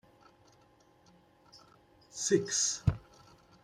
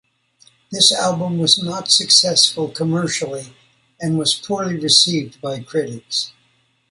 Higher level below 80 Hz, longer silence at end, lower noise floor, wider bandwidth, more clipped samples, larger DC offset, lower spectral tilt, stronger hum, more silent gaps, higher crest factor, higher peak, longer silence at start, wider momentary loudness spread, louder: first, -56 dBFS vs -62 dBFS; about the same, 0.65 s vs 0.6 s; about the same, -64 dBFS vs -61 dBFS; first, 13.5 kHz vs 11.5 kHz; neither; neither; about the same, -3.5 dB/octave vs -3 dB/octave; neither; neither; about the same, 24 dB vs 20 dB; second, -14 dBFS vs 0 dBFS; first, 1.55 s vs 0.7 s; about the same, 17 LU vs 16 LU; second, -31 LUFS vs -16 LUFS